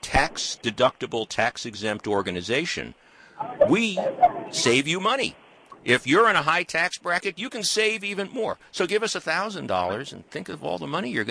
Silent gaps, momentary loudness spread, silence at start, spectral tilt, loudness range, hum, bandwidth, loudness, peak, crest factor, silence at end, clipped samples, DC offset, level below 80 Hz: none; 11 LU; 0 s; -3.5 dB/octave; 5 LU; none; 11 kHz; -24 LUFS; -6 dBFS; 20 dB; 0 s; under 0.1%; under 0.1%; -48 dBFS